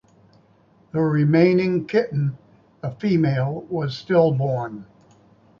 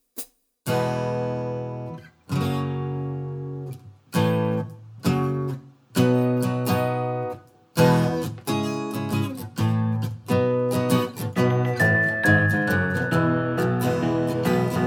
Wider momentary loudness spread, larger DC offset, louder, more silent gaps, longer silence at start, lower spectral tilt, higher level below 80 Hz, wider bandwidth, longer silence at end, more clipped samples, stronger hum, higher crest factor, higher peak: about the same, 13 LU vs 14 LU; neither; first, -21 LUFS vs -24 LUFS; neither; first, 0.95 s vs 0.15 s; first, -9 dB/octave vs -6.5 dB/octave; about the same, -60 dBFS vs -58 dBFS; second, 7 kHz vs over 20 kHz; first, 0.75 s vs 0 s; neither; neither; about the same, 18 dB vs 18 dB; about the same, -4 dBFS vs -6 dBFS